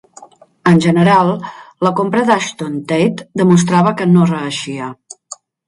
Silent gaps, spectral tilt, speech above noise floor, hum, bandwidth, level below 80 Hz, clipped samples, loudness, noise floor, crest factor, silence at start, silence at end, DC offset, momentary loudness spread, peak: none; -6 dB/octave; 29 dB; none; 11.5 kHz; -54 dBFS; under 0.1%; -14 LUFS; -42 dBFS; 14 dB; 0.2 s; 0.35 s; under 0.1%; 16 LU; 0 dBFS